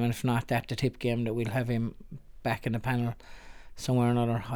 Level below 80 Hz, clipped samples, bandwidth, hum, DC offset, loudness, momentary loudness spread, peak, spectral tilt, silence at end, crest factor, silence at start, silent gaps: -50 dBFS; under 0.1%; 18 kHz; none; under 0.1%; -30 LUFS; 11 LU; -14 dBFS; -7 dB/octave; 0 s; 16 dB; 0 s; none